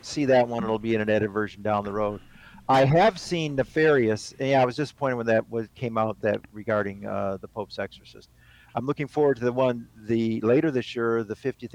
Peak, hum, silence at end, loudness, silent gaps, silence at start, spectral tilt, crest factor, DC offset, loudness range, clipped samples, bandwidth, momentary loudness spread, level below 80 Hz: -12 dBFS; none; 0.05 s; -25 LUFS; none; 0.05 s; -6.5 dB/octave; 14 dB; under 0.1%; 6 LU; under 0.1%; 12.5 kHz; 11 LU; -56 dBFS